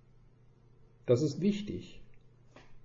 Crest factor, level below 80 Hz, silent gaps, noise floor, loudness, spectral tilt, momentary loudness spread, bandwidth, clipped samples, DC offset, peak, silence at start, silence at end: 20 dB; -60 dBFS; none; -61 dBFS; -33 LUFS; -7.5 dB/octave; 15 LU; 7.8 kHz; under 0.1%; under 0.1%; -16 dBFS; 1.1 s; 0 s